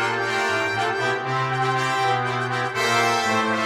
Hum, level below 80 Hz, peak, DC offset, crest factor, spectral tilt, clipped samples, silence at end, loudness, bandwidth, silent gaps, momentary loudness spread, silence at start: none; -62 dBFS; -6 dBFS; under 0.1%; 16 dB; -4 dB/octave; under 0.1%; 0 s; -22 LUFS; 16 kHz; none; 4 LU; 0 s